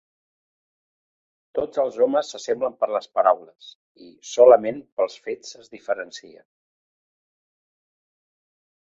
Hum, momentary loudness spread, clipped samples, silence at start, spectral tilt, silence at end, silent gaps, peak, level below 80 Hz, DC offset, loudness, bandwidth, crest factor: none; 21 LU; under 0.1%; 1.55 s; -3.5 dB/octave; 2.65 s; 3.75-3.95 s, 4.92-4.97 s; -2 dBFS; -70 dBFS; under 0.1%; -21 LUFS; 7.8 kHz; 22 dB